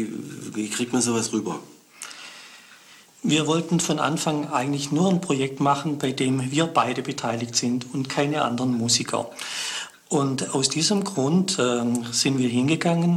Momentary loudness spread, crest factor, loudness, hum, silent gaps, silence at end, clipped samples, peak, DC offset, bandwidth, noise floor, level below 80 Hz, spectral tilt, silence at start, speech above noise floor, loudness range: 11 LU; 18 dB; -23 LUFS; none; none; 0 s; under 0.1%; -6 dBFS; under 0.1%; 16 kHz; -50 dBFS; -66 dBFS; -4 dB/octave; 0 s; 27 dB; 3 LU